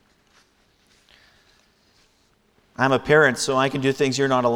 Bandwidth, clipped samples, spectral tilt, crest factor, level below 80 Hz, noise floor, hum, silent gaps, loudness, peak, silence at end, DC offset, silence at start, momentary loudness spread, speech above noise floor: 17 kHz; under 0.1%; -4.5 dB/octave; 20 dB; -56 dBFS; -62 dBFS; none; none; -20 LUFS; -4 dBFS; 0 s; under 0.1%; 2.8 s; 6 LU; 43 dB